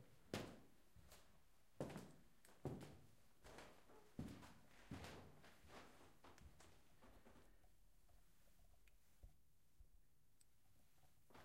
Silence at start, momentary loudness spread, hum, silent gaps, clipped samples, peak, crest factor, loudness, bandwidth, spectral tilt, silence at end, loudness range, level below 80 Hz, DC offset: 0 s; 14 LU; none; none; under 0.1%; -32 dBFS; 30 dB; -59 LUFS; 16 kHz; -5.5 dB/octave; 0 s; 10 LU; -74 dBFS; under 0.1%